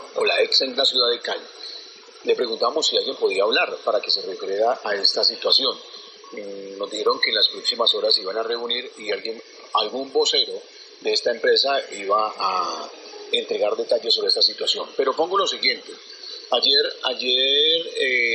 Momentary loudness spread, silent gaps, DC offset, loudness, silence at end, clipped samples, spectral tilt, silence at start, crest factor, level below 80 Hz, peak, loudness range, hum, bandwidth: 18 LU; none; under 0.1%; -20 LUFS; 0 s; under 0.1%; -0.5 dB/octave; 0 s; 20 dB; -84 dBFS; -2 dBFS; 3 LU; none; 8.8 kHz